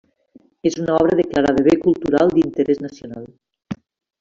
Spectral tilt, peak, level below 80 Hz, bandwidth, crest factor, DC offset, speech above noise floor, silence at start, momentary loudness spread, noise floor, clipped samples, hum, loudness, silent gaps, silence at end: -6.5 dB/octave; -2 dBFS; -50 dBFS; 7.6 kHz; 16 dB; under 0.1%; 35 dB; 0.65 s; 18 LU; -52 dBFS; under 0.1%; none; -17 LUFS; none; 0.45 s